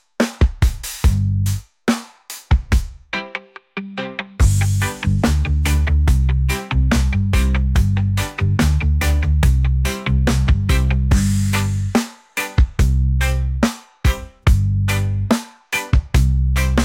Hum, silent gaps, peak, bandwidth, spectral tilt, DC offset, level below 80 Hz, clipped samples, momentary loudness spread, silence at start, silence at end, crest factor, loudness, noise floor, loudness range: none; none; -4 dBFS; 16.5 kHz; -5.5 dB/octave; under 0.1%; -20 dBFS; under 0.1%; 8 LU; 0.2 s; 0 s; 14 dB; -19 LUFS; -37 dBFS; 4 LU